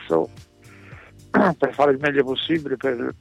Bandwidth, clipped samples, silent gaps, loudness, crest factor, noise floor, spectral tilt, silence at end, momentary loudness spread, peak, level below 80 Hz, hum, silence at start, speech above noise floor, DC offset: 11 kHz; under 0.1%; none; -21 LUFS; 16 dB; -47 dBFS; -6.5 dB/octave; 0.05 s; 6 LU; -6 dBFS; -58 dBFS; none; 0 s; 26 dB; under 0.1%